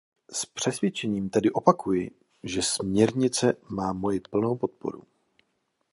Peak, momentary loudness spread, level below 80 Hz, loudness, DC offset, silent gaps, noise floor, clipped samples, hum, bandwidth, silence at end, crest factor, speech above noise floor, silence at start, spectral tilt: -2 dBFS; 12 LU; -58 dBFS; -26 LUFS; under 0.1%; none; -75 dBFS; under 0.1%; none; 11.5 kHz; 0.9 s; 24 dB; 49 dB; 0.3 s; -4.5 dB/octave